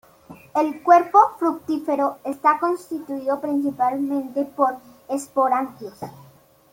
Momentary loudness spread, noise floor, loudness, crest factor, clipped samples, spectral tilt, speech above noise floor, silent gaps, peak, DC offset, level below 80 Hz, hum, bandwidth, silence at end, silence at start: 14 LU; -46 dBFS; -21 LUFS; 20 dB; under 0.1%; -5.5 dB/octave; 25 dB; none; -2 dBFS; under 0.1%; -68 dBFS; none; 17 kHz; 0.5 s; 0.3 s